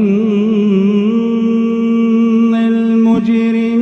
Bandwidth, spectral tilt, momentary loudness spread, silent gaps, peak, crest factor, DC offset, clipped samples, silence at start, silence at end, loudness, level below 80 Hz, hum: 6.6 kHz; -8.5 dB/octave; 2 LU; none; -2 dBFS; 10 dB; under 0.1%; under 0.1%; 0 s; 0 s; -12 LUFS; -56 dBFS; none